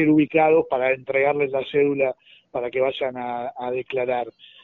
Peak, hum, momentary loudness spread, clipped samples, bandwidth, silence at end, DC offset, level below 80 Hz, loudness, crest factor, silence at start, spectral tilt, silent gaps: -6 dBFS; none; 11 LU; under 0.1%; 4.1 kHz; 0.35 s; under 0.1%; -62 dBFS; -22 LUFS; 16 dB; 0 s; -4.5 dB/octave; none